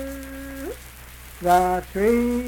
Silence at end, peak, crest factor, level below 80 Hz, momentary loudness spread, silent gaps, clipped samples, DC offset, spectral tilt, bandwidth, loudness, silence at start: 0 s; -6 dBFS; 18 dB; -40 dBFS; 22 LU; none; under 0.1%; under 0.1%; -5.5 dB/octave; 19 kHz; -22 LUFS; 0 s